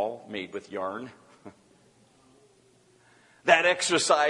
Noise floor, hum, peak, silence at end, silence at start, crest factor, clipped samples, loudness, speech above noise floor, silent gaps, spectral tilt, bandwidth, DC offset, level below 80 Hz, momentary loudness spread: -61 dBFS; none; -4 dBFS; 0 s; 0 s; 24 dB; under 0.1%; -26 LUFS; 36 dB; none; -2 dB/octave; 11.5 kHz; under 0.1%; -76 dBFS; 17 LU